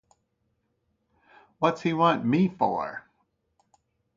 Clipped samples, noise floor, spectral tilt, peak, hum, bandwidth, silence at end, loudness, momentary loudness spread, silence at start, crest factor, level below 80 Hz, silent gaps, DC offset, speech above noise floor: under 0.1%; -75 dBFS; -7.5 dB/octave; -8 dBFS; none; 7.4 kHz; 1.15 s; -25 LUFS; 11 LU; 1.6 s; 22 dB; -68 dBFS; none; under 0.1%; 50 dB